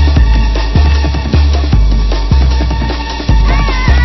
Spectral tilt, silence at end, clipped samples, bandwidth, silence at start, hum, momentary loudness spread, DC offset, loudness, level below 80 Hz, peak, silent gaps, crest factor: -6.5 dB/octave; 0 s; under 0.1%; 6 kHz; 0 s; none; 4 LU; under 0.1%; -12 LUFS; -10 dBFS; 0 dBFS; none; 8 dB